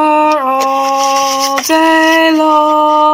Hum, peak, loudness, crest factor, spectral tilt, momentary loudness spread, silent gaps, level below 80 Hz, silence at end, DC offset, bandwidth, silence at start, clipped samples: none; 0 dBFS; -10 LUFS; 10 dB; -1 dB/octave; 4 LU; none; -54 dBFS; 0 s; under 0.1%; 16.5 kHz; 0 s; 0.3%